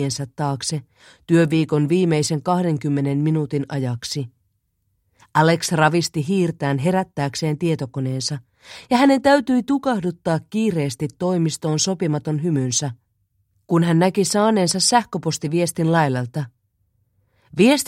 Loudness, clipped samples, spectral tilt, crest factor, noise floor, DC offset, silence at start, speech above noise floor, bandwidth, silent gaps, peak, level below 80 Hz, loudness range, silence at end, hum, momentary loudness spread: -20 LUFS; under 0.1%; -5 dB/octave; 20 dB; -69 dBFS; under 0.1%; 0 s; 50 dB; 15 kHz; none; 0 dBFS; -58 dBFS; 3 LU; 0 s; none; 9 LU